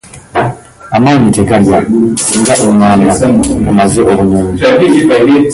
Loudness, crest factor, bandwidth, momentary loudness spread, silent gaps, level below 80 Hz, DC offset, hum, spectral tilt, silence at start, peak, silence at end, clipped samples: -8 LUFS; 8 dB; 12 kHz; 8 LU; none; -30 dBFS; under 0.1%; none; -5.5 dB/octave; 0.15 s; 0 dBFS; 0 s; under 0.1%